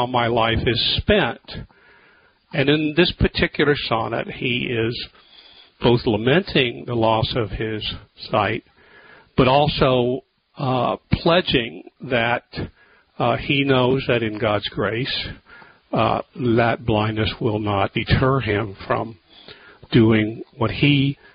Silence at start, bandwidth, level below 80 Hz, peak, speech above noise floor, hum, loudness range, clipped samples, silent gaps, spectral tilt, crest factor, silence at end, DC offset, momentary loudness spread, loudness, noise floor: 0 s; 5.2 kHz; -38 dBFS; -2 dBFS; 35 dB; none; 2 LU; under 0.1%; none; -11 dB/octave; 18 dB; 0.2 s; under 0.1%; 10 LU; -20 LUFS; -55 dBFS